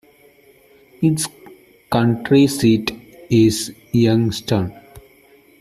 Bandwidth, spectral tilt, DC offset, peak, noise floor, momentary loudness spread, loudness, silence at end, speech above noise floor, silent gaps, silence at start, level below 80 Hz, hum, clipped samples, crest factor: 15 kHz; -6 dB/octave; under 0.1%; -2 dBFS; -51 dBFS; 11 LU; -18 LUFS; 0.6 s; 35 dB; none; 1 s; -50 dBFS; none; under 0.1%; 16 dB